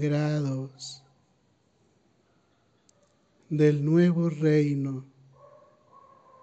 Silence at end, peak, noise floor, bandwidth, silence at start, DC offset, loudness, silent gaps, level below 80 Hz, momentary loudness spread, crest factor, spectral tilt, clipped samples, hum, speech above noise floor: 1.4 s; -10 dBFS; -67 dBFS; 8.2 kHz; 0 s; under 0.1%; -25 LUFS; none; -68 dBFS; 18 LU; 18 dB; -8 dB/octave; under 0.1%; none; 43 dB